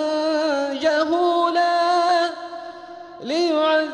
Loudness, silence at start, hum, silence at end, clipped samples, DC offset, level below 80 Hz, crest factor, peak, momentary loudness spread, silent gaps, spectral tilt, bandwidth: -20 LUFS; 0 s; none; 0 s; under 0.1%; under 0.1%; -68 dBFS; 14 dB; -8 dBFS; 17 LU; none; -2.5 dB/octave; 10.5 kHz